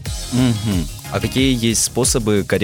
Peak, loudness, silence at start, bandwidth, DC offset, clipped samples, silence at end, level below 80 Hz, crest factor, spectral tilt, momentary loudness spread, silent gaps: -2 dBFS; -18 LUFS; 0 s; 19 kHz; under 0.1%; under 0.1%; 0 s; -32 dBFS; 16 dB; -4 dB/octave; 7 LU; none